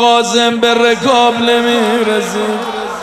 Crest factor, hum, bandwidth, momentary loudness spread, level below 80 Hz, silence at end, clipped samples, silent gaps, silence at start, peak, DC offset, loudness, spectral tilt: 12 dB; none; 14.5 kHz; 7 LU; -50 dBFS; 0 s; under 0.1%; none; 0 s; 0 dBFS; under 0.1%; -12 LUFS; -3 dB/octave